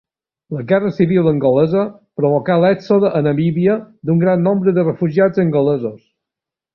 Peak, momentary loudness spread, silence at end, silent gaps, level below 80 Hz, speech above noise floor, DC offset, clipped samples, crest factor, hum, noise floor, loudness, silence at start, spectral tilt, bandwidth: -2 dBFS; 7 LU; 0.8 s; none; -54 dBFS; 71 dB; under 0.1%; under 0.1%; 14 dB; none; -86 dBFS; -15 LUFS; 0.5 s; -10 dB/octave; 6 kHz